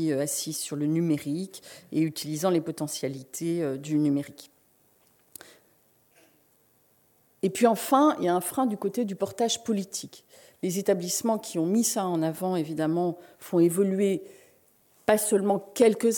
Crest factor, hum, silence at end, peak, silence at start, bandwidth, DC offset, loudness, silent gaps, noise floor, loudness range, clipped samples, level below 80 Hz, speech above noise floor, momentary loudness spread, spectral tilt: 22 dB; none; 0 s; -6 dBFS; 0 s; 17.5 kHz; under 0.1%; -27 LUFS; none; -65 dBFS; 6 LU; under 0.1%; -74 dBFS; 38 dB; 11 LU; -5 dB/octave